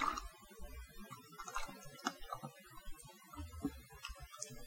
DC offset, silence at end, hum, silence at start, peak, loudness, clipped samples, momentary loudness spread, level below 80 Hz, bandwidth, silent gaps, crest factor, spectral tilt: under 0.1%; 0 s; none; 0 s; -20 dBFS; -49 LUFS; under 0.1%; 11 LU; -56 dBFS; 16.5 kHz; none; 26 dB; -3.5 dB/octave